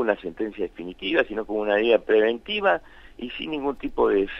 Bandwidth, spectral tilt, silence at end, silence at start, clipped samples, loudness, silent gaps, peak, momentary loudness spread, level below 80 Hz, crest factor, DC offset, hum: 5.8 kHz; -6.5 dB/octave; 0 s; 0 s; under 0.1%; -24 LUFS; none; -6 dBFS; 12 LU; -50 dBFS; 18 dB; under 0.1%; none